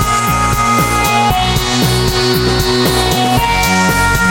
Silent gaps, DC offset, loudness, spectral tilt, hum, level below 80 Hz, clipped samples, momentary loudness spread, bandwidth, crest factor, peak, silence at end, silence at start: none; under 0.1%; -12 LUFS; -4 dB/octave; none; -24 dBFS; under 0.1%; 2 LU; 17 kHz; 12 dB; 0 dBFS; 0 s; 0 s